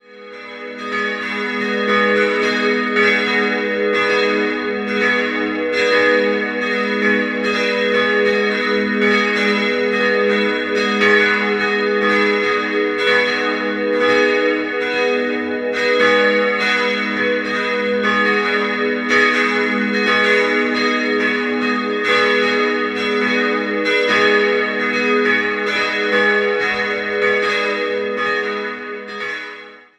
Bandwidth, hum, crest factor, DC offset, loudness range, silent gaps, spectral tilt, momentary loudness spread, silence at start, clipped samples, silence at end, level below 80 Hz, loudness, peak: 10.5 kHz; none; 16 dB; under 0.1%; 1 LU; none; -4 dB/octave; 7 LU; 0.1 s; under 0.1%; 0.2 s; -58 dBFS; -16 LUFS; -2 dBFS